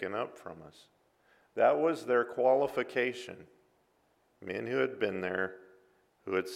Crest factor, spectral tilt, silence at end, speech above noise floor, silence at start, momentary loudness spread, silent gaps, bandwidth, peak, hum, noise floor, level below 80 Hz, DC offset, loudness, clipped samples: 20 dB; -5.5 dB/octave; 0 s; 40 dB; 0 s; 21 LU; none; 14.5 kHz; -14 dBFS; none; -72 dBFS; -78 dBFS; under 0.1%; -31 LUFS; under 0.1%